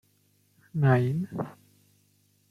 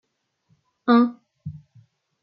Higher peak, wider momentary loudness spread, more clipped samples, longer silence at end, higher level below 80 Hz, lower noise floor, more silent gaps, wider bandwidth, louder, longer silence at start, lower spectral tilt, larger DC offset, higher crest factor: second, -10 dBFS vs -6 dBFS; second, 14 LU vs 21 LU; neither; first, 1 s vs 0.65 s; about the same, -66 dBFS vs -68 dBFS; about the same, -67 dBFS vs -68 dBFS; neither; about the same, 6 kHz vs 5.6 kHz; second, -27 LUFS vs -20 LUFS; about the same, 0.75 s vs 0.85 s; about the same, -9 dB/octave vs -9.5 dB/octave; neither; about the same, 20 dB vs 20 dB